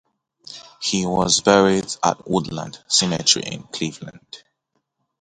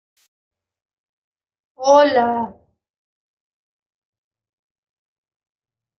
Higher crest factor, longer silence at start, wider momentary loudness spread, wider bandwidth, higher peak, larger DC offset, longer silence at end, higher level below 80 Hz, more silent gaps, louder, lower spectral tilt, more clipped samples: about the same, 22 dB vs 22 dB; second, 0.5 s vs 1.8 s; first, 23 LU vs 13 LU; first, 11 kHz vs 6.6 kHz; about the same, 0 dBFS vs -2 dBFS; neither; second, 0.85 s vs 3.45 s; first, -52 dBFS vs -68 dBFS; neither; second, -19 LUFS vs -16 LUFS; about the same, -3 dB/octave vs -3.5 dB/octave; neither